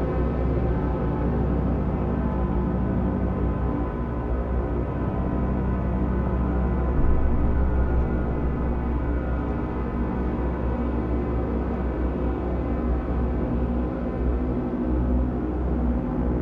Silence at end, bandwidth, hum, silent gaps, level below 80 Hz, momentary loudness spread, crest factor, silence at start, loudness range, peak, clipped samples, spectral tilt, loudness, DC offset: 0 s; 3.6 kHz; 60 Hz at -40 dBFS; none; -26 dBFS; 3 LU; 14 dB; 0 s; 2 LU; -10 dBFS; under 0.1%; -11 dB/octave; -26 LUFS; under 0.1%